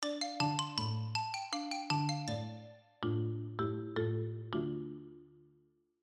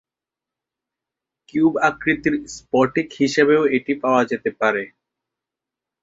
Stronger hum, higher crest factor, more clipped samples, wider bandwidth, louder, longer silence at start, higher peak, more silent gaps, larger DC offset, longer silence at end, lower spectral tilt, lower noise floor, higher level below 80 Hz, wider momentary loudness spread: neither; about the same, 20 dB vs 20 dB; neither; first, 11.5 kHz vs 8 kHz; second, -37 LUFS vs -19 LUFS; second, 0 s vs 1.55 s; second, -18 dBFS vs -2 dBFS; neither; neither; second, 0.65 s vs 1.15 s; about the same, -5 dB/octave vs -5.5 dB/octave; second, -72 dBFS vs -88 dBFS; second, -74 dBFS vs -58 dBFS; first, 12 LU vs 9 LU